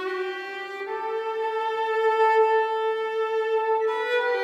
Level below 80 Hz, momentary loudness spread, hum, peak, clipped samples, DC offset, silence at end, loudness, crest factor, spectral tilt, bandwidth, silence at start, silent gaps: under -90 dBFS; 11 LU; none; -10 dBFS; under 0.1%; under 0.1%; 0 s; -25 LUFS; 14 dB; -2 dB/octave; 8 kHz; 0 s; none